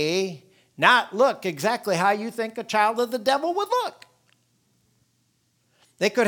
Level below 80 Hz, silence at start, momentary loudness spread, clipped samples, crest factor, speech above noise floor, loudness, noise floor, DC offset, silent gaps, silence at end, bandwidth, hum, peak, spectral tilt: -78 dBFS; 0 s; 12 LU; under 0.1%; 22 dB; 46 dB; -23 LUFS; -68 dBFS; under 0.1%; none; 0 s; 19.5 kHz; none; -2 dBFS; -3.5 dB/octave